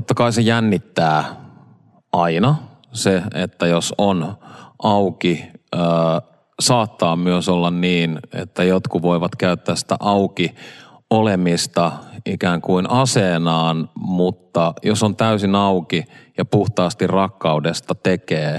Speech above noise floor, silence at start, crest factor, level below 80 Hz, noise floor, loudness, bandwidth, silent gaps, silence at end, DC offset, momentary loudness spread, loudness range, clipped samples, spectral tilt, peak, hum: 33 dB; 0 s; 16 dB; -60 dBFS; -51 dBFS; -18 LUFS; 13 kHz; none; 0 s; under 0.1%; 8 LU; 2 LU; under 0.1%; -5.5 dB/octave; -2 dBFS; none